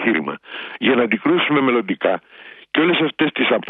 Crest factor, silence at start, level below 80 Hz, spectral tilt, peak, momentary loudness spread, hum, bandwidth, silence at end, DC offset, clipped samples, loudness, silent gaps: 16 dB; 0 s; -64 dBFS; -9 dB/octave; -2 dBFS; 10 LU; none; 4.1 kHz; 0 s; under 0.1%; under 0.1%; -18 LUFS; none